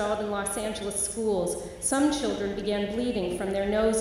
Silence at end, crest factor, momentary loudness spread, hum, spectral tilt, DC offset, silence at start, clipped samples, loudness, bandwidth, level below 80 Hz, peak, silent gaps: 0 s; 14 dB; 5 LU; none; -4 dB/octave; under 0.1%; 0 s; under 0.1%; -28 LUFS; 16 kHz; -48 dBFS; -12 dBFS; none